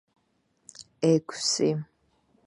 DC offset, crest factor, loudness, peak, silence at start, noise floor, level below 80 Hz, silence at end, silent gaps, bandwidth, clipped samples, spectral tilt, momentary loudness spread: under 0.1%; 20 dB; -26 LUFS; -10 dBFS; 0.8 s; -71 dBFS; -72 dBFS; 0.65 s; none; 11.5 kHz; under 0.1%; -4.5 dB/octave; 23 LU